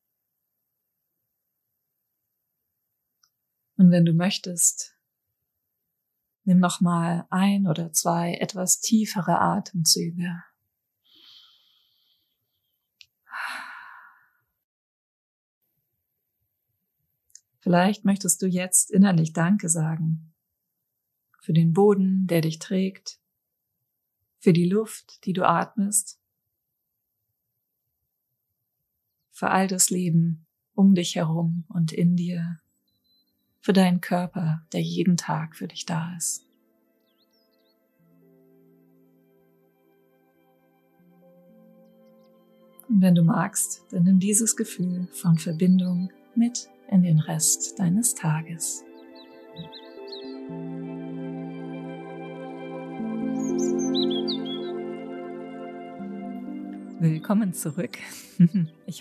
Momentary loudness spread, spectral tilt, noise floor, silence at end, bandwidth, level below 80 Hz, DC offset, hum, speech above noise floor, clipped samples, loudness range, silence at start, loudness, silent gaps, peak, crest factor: 17 LU; -5 dB/octave; -80 dBFS; 0 s; 14.5 kHz; -76 dBFS; under 0.1%; none; 58 dB; under 0.1%; 14 LU; 3.8 s; -23 LUFS; 14.64-15.61 s; -6 dBFS; 20 dB